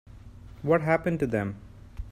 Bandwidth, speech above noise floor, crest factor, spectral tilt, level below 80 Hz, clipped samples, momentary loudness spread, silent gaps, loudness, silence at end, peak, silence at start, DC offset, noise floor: 14 kHz; 20 dB; 18 dB; -8.5 dB/octave; -46 dBFS; under 0.1%; 21 LU; none; -27 LUFS; 0 s; -10 dBFS; 0.1 s; under 0.1%; -46 dBFS